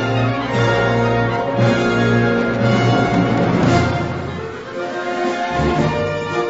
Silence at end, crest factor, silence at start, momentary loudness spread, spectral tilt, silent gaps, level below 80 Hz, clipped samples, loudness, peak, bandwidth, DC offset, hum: 0 s; 14 dB; 0 s; 9 LU; -7 dB/octave; none; -38 dBFS; under 0.1%; -17 LUFS; -2 dBFS; 8 kHz; under 0.1%; none